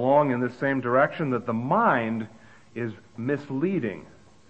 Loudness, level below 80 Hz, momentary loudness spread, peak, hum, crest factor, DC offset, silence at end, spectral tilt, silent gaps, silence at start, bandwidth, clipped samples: -26 LUFS; -66 dBFS; 13 LU; -8 dBFS; none; 18 dB; 0.2%; 0.45 s; -8.5 dB/octave; none; 0 s; 8.4 kHz; under 0.1%